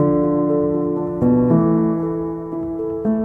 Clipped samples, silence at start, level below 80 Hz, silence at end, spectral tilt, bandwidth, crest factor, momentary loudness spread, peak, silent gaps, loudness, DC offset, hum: under 0.1%; 0 s; -44 dBFS; 0 s; -13 dB/octave; 2.7 kHz; 14 dB; 10 LU; -4 dBFS; none; -19 LUFS; under 0.1%; none